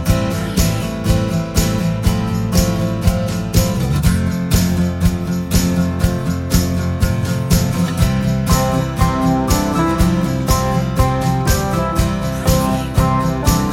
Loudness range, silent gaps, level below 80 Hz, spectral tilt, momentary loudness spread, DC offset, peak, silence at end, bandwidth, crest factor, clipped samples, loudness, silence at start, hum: 1 LU; none; -24 dBFS; -5.5 dB/octave; 3 LU; under 0.1%; 0 dBFS; 0 s; 17 kHz; 16 dB; under 0.1%; -17 LUFS; 0 s; none